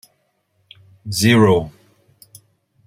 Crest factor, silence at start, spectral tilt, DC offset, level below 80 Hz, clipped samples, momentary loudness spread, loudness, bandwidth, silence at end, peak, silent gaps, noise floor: 20 dB; 1.05 s; -5.5 dB/octave; under 0.1%; -52 dBFS; under 0.1%; 23 LU; -15 LUFS; 16 kHz; 1.15 s; 0 dBFS; none; -66 dBFS